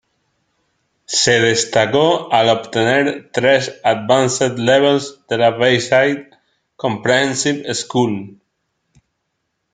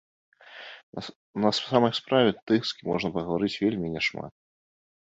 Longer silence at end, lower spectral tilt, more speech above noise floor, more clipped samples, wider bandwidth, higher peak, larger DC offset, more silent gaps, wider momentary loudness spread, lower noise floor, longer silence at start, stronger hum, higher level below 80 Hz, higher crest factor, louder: first, 1.45 s vs 0.75 s; second, -3.5 dB/octave vs -5.5 dB/octave; first, 57 dB vs 20 dB; neither; first, 9.6 kHz vs 8.2 kHz; first, 0 dBFS vs -6 dBFS; neither; second, none vs 0.83-0.93 s, 1.16-1.34 s, 2.42-2.46 s; second, 7 LU vs 17 LU; first, -72 dBFS vs -46 dBFS; first, 1.1 s vs 0.45 s; neither; about the same, -58 dBFS vs -60 dBFS; second, 16 dB vs 22 dB; first, -15 LUFS vs -26 LUFS